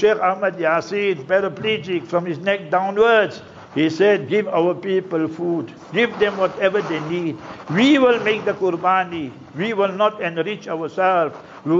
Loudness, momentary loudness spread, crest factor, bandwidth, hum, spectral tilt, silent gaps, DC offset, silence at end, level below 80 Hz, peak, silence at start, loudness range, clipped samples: -20 LUFS; 11 LU; 14 dB; 7.6 kHz; none; -6 dB/octave; none; under 0.1%; 0 s; -62 dBFS; -6 dBFS; 0 s; 2 LU; under 0.1%